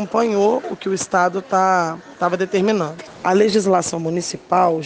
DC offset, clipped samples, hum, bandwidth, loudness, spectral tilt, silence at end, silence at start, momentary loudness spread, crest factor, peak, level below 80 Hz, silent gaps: under 0.1%; under 0.1%; none; 10 kHz; -19 LUFS; -5 dB/octave; 0 s; 0 s; 8 LU; 14 dB; -4 dBFS; -62 dBFS; none